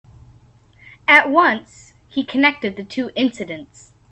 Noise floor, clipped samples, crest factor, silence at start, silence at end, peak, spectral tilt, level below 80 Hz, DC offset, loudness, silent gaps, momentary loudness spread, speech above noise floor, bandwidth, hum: -50 dBFS; under 0.1%; 20 dB; 1.1 s; 0.45 s; 0 dBFS; -4 dB/octave; -58 dBFS; under 0.1%; -17 LUFS; none; 17 LU; 32 dB; 10.5 kHz; none